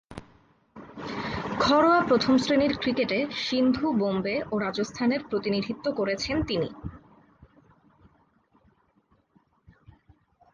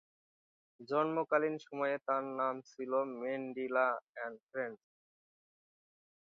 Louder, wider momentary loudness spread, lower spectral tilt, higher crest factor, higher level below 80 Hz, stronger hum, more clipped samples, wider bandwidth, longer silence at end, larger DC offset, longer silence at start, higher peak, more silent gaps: first, -26 LUFS vs -36 LUFS; first, 15 LU vs 10 LU; first, -5.5 dB/octave vs -4 dB/octave; about the same, 18 dB vs 20 dB; first, -52 dBFS vs under -90 dBFS; neither; neither; first, 7.8 kHz vs 6.6 kHz; first, 3.55 s vs 1.55 s; neither; second, 0.1 s vs 0.8 s; first, -10 dBFS vs -18 dBFS; second, none vs 4.03-4.13 s, 4.43-4.47 s